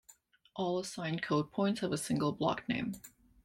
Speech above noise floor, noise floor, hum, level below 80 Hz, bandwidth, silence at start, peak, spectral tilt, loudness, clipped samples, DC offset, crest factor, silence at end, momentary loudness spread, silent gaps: 30 dB; -64 dBFS; none; -68 dBFS; 16.5 kHz; 0.55 s; -18 dBFS; -5.5 dB/octave; -35 LUFS; under 0.1%; under 0.1%; 18 dB; 0.35 s; 7 LU; none